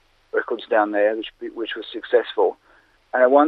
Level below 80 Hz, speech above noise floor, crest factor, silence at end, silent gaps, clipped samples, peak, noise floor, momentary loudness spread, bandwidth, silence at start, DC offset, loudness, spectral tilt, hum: -66 dBFS; 37 dB; 20 dB; 0 s; none; under 0.1%; -2 dBFS; -57 dBFS; 11 LU; 4.9 kHz; 0.35 s; under 0.1%; -22 LUFS; -6 dB/octave; none